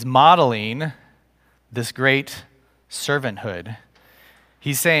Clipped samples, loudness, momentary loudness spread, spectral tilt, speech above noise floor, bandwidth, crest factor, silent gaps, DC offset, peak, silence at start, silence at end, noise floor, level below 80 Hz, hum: under 0.1%; -20 LUFS; 21 LU; -4 dB/octave; 41 dB; 16 kHz; 20 dB; none; under 0.1%; 0 dBFS; 0 s; 0 s; -61 dBFS; -62 dBFS; none